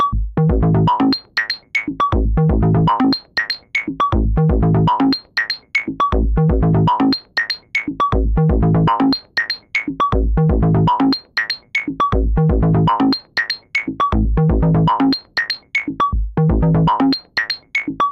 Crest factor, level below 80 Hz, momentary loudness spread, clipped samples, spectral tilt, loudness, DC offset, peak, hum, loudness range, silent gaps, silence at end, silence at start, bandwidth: 10 dB; -24 dBFS; 6 LU; under 0.1%; -7.5 dB/octave; -17 LUFS; under 0.1%; -6 dBFS; none; 1 LU; none; 0 s; 0 s; 7 kHz